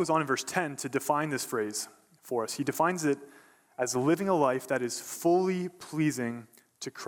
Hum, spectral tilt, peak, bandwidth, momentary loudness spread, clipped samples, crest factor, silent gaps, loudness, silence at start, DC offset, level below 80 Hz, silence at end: none; -4.5 dB/octave; -10 dBFS; 19.5 kHz; 10 LU; under 0.1%; 20 dB; none; -30 LUFS; 0 s; under 0.1%; -76 dBFS; 0 s